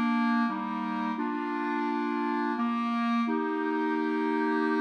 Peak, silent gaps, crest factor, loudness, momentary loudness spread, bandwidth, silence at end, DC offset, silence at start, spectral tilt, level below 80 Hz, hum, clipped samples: -16 dBFS; none; 12 dB; -29 LUFS; 4 LU; 6.4 kHz; 0 s; under 0.1%; 0 s; -6.5 dB/octave; under -90 dBFS; none; under 0.1%